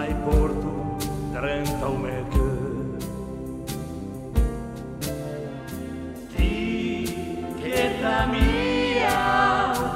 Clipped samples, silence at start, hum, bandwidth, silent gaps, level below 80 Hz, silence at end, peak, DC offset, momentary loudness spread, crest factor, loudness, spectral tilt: under 0.1%; 0 s; none; 16 kHz; none; -30 dBFS; 0 s; -8 dBFS; under 0.1%; 13 LU; 16 dB; -26 LUFS; -5.5 dB/octave